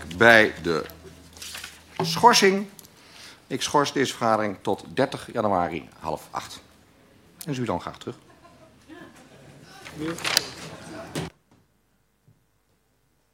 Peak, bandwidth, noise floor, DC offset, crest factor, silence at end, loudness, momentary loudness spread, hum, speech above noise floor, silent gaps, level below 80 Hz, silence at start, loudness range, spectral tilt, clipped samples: 0 dBFS; 16.5 kHz; -68 dBFS; under 0.1%; 26 dB; 2.05 s; -23 LUFS; 24 LU; none; 45 dB; none; -58 dBFS; 0 s; 13 LU; -3.5 dB/octave; under 0.1%